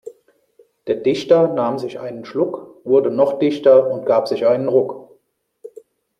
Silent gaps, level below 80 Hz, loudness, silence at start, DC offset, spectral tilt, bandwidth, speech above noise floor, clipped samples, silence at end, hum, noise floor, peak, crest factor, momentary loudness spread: none; -66 dBFS; -17 LUFS; 0.05 s; under 0.1%; -7 dB/octave; 9.6 kHz; 47 dB; under 0.1%; 0.5 s; none; -63 dBFS; -2 dBFS; 16 dB; 14 LU